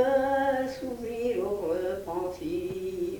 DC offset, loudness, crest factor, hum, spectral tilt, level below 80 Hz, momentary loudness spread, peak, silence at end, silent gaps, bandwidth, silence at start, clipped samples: under 0.1%; -30 LUFS; 16 dB; none; -6 dB/octave; -54 dBFS; 8 LU; -14 dBFS; 0 s; none; 19 kHz; 0 s; under 0.1%